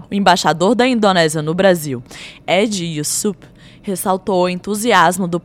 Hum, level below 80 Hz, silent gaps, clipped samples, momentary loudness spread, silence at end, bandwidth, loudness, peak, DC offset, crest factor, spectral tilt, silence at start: none; -52 dBFS; none; under 0.1%; 13 LU; 0.05 s; 17 kHz; -15 LUFS; 0 dBFS; under 0.1%; 16 dB; -4 dB/octave; 0 s